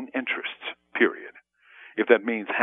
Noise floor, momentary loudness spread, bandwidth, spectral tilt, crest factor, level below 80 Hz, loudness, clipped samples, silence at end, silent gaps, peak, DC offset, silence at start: -54 dBFS; 16 LU; 3.9 kHz; -7.5 dB/octave; 24 dB; -82 dBFS; -25 LUFS; under 0.1%; 0 s; none; -4 dBFS; under 0.1%; 0 s